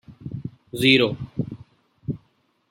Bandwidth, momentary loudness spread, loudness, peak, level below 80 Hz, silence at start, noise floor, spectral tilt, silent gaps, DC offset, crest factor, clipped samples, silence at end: 16.5 kHz; 20 LU; -22 LUFS; -2 dBFS; -54 dBFS; 0.1 s; -65 dBFS; -5.5 dB/octave; none; under 0.1%; 24 dB; under 0.1%; 0.55 s